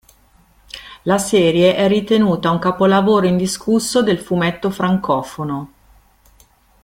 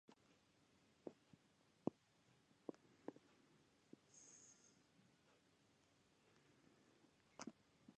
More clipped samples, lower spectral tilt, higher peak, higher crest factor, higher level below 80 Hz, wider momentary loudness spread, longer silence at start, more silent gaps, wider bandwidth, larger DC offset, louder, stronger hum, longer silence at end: neither; about the same, -5.5 dB/octave vs -5 dB/octave; first, 0 dBFS vs -26 dBFS; second, 16 dB vs 36 dB; first, -50 dBFS vs under -90 dBFS; about the same, 12 LU vs 14 LU; first, 0.75 s vs 0.1 s; neither; first, 16 kHz vs 9.4 kHz; neither; first, -16 LUFS vs -58 LUFS; neither; first, 1.2 s vs 0.05 s